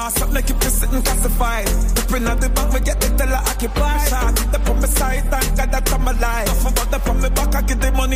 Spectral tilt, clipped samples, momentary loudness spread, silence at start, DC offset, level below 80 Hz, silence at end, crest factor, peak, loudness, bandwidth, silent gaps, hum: -4 dB/octave; under 0.1%; 2 LU; 0 s; under 0.1%; -18 dBFS; 0 s; 14 dB; -2 dBFS; -19 LUFS; 16 kHz; none; none